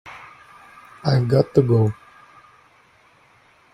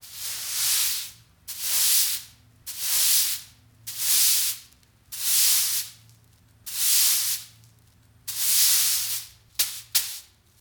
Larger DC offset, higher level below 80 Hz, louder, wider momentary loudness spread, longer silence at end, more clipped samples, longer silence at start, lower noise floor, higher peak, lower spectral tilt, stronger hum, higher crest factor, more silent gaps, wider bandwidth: neither; first, -54 dBFS vs -64 dBFS; about the same, -19 LUFS vs -21 LUFS; first, 23 LU vs 19 LU; first, 1.8 s vs 0.4 s; neither; about the same, 0.05 s vs 0.05 s; about the same, -55 dBFS vs -57 dBFS; first, -2 dBFS vs -6 dBFS; first, -8.5 dB/octave vs 3.5 dB/octave; neither; about the same, 20 dB vs 20 dB; neither; second, 10 kHz vs 19.5 kHz